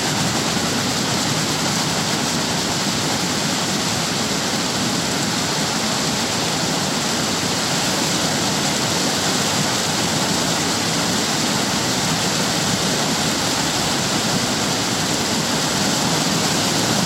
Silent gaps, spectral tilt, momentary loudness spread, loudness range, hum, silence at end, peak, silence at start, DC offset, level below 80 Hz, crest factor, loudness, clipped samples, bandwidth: none; -2.5 dB/octave; 2 LU; 1 LU; none; 0 s; -6 dBFS; 0 s; under 0.1%; -48 dBFS; 14 dB; -18 LUFS; under 0.1%; 16 kHz